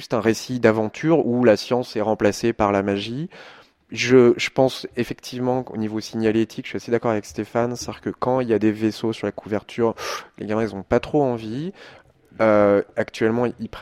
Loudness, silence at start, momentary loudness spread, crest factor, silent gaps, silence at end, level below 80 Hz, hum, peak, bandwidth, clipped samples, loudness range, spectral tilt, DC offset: -21 LUFS; 0 s; 12 LU; 20 dB; none; 0 s; -52 dBFS; none; -2 dBFS; 15.5 kHz; under 0.1%; 4 LU; -6 dB/octave; under 0.1%